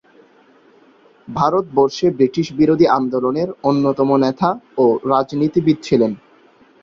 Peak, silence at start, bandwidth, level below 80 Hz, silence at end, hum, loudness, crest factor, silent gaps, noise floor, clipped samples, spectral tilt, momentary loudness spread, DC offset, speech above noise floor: -2 dBFS; 1.3 s; 7.6 kHz; -54 dBFS; 0.65 s; none; -17 LUFS; 16 dB; none; -51 dBFS; under 0.1%; -7.5 dB/octave; 5 LU; under 0.1%; 35 dB